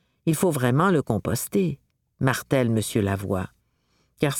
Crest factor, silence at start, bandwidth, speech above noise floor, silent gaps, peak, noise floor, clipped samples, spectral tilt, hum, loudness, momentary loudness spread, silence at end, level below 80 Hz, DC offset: 18 dB; 0.25 s; 19 kHz; 45 dB; none; -6 dBFS; -68 dBFS; under 0.1%; -6 dB/octave; none; -24 LUFS; 8 LU; 0 s; -54 dBFS; under 0.1%